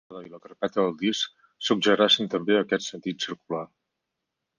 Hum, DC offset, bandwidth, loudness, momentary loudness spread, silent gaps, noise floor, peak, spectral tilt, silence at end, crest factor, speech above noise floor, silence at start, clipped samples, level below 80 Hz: none; under 0.1%; 10 kHz; -25 LUFS; 17 LU; none; -83 dBFS; -6 dBFS; -4 dB/octave; 0.9 s; 20 dB; 58 dB; 0.1 s; under 0.1%; -72 dBFS